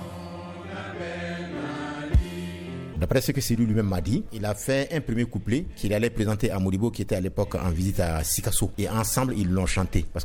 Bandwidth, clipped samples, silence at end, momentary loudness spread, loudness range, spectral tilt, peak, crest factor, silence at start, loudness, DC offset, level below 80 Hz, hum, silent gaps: 19.5 kHz; under 0.1%; 0 s; 11 LU; 2 LU; -5.5 dB/octave; -6 dBFS; 20 dB; 0 s; -27 LUFS; under 0.1%; -36 dBFS; none; none